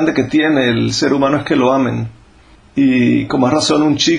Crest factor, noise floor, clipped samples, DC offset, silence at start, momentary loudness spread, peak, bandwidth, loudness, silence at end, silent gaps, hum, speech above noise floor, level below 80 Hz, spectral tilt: 14 dB; -45 dBFS; under 0.1%; under 0.1%; 0 s; 5 LU; 0 dBFS; 10 kHz; -14 LUFS; 0 s; none; none; 32 dB; -46 dBFS; -5 dB/octave